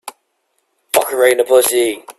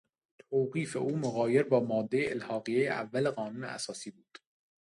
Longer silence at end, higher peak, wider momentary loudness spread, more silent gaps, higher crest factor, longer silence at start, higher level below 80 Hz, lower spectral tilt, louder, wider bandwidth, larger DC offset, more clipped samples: second, 0.05 s vs 0.75 s; first, 0 dBFS vs -14 dBFS; second, 6 LU vs 10 LU; neither; about the same, 16 dB vs 20 dB; second, 0.05 s vs 0.5 s; first, -62 dBFS vs -74 dBFS; second, -1 dB/octave vs -6 dB/octave; first, -13 LUFS vs -32 LUFS; first, 15.5 kHz vs 11.5 kHz; neither; neither